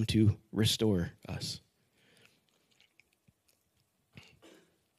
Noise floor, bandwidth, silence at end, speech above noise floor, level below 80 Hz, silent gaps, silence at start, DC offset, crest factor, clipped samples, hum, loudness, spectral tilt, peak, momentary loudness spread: -76 dBFS; 15 kHz; 3.4 s; 45 dB; -62 dBFS; none; 0 s; under 0.1%; 20 dB; under 0.1%; none; -32 LUFS; -5.5 dB/octave; -16 dBFS; 12 LU